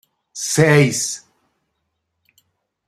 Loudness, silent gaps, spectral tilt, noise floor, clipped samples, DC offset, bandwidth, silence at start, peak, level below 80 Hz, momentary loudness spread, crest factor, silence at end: -16 LUFS; none; -4.5 dB/octave; -74 dBFS; under 0.1%; under 0.1%; 15.5 kHz; 0.35 s; -2 dBFS; -56 dBFS; 18 LU; 20 dB; 1.7 s